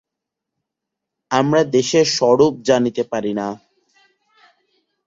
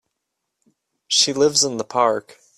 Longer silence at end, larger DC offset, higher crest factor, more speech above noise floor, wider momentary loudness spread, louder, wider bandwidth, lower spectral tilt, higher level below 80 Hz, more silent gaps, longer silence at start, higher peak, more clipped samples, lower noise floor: first, 1.5 s vs 0.4 s; neither; about the same, 18 dB vs 20 dB; first, 66 dB vs 59 dB; first, 10 LU vs 5 LU; about the same, -17 LUFS vs -18 LUFS; second, 7.8 kHz vs 14.5 kHz; first, -4.5 dB/octave vs -2 dB/octave; first, -60 dBFS vs -66 dBFS; neither; first, 1.3 s vs 1.1 s; about the same, -2 dBFS vs -2 dBFS; neither; about the same, -82 dBFS vs -79 dBFS